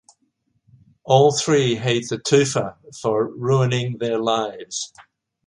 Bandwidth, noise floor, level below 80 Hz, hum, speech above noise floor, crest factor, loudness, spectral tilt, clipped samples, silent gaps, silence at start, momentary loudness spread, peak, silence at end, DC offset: 11.5 kHz; -69 dBFS; -60 dBFS; none; 49 dB; 20 dB; -20 LUFS; -5 dB/octave; under 0.1%; none; 1.05 s; 13 LU; 0 dBFS; 0.45 s; under 0.1%